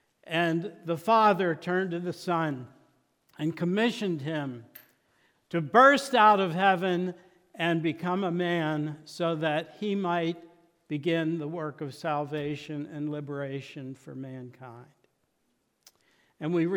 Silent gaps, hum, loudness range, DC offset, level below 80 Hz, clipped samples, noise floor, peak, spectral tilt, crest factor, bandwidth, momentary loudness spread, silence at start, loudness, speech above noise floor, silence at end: none; none; 13 LU; under 0.1%; -78 dBFS; under 0.1%; -75 dBFS; -6 dBFS; -6 dB/octave; 22 dB; 17.5 kHz; 19 LU; 0.25 s; -28 LUFS; 47 dB; 0 s